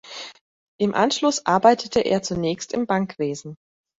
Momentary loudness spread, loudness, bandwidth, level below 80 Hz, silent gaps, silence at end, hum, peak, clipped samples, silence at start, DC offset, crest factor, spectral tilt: 18 LU; -21 LUFS; 8 kHz; -58 dBFS; 0.41-0.79 s; 0.45 s; none; -2 dBFS; under 0.1%; 0.05 s; under 0.1%; 20 dB; -4.5 dB/octave